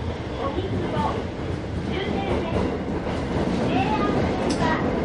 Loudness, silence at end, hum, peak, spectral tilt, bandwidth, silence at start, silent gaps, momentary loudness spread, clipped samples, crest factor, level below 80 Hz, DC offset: -25 LUFS; 0 s; none; -8 dBFS; -6.5 dB/octave; 11.5 kHz; 0 s; none; 6 LU; under 0.1%; 16 dB; -36 dBFS; under 0.1%